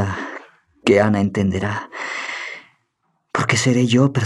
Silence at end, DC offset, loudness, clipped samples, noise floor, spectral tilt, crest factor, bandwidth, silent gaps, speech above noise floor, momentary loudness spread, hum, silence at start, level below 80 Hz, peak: 0 s; under 0.1%; -19 LUFS; under 0.1%; -69 dBFS; -5.5 dB/octave; 18 dB; 12 kHz; none; 52 dB; 16 LU; none; 0 s; -60 dBFS; 0 dBFS